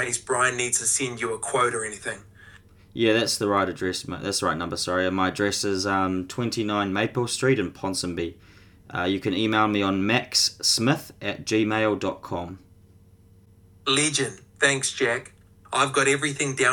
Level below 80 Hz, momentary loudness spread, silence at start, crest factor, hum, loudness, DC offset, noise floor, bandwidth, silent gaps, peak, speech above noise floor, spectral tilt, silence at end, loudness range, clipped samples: -58 dBFS; 10 LU; 0 s; 20 dB; none; -24 LUFS; under 0.1%; -54 dBFS; 19 kHz; none; -4 dBFS; 29 dB; -3 dB/octave; 0 s; 3 LU; under 0.1%